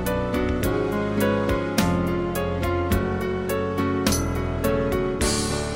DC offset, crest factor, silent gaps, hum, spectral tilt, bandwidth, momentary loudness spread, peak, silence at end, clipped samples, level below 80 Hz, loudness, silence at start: 0.2%; 18 dB; none; none; -5 dB/octave; 16.5 kHz; 3 LU; -6 dBFS; 0 s; under 0.1%; -34 dBFS; -24 LUFS; 0 s